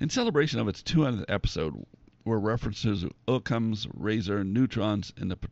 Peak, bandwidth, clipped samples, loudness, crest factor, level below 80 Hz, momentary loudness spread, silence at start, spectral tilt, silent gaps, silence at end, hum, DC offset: -12 dBFS; 8 kHz; under 0.1%; -29 LUFS; 18 dB; -46 dBFS; 7 LU; 0 s; -5.5 dB/octave; none; 0 s; none; under 0.1%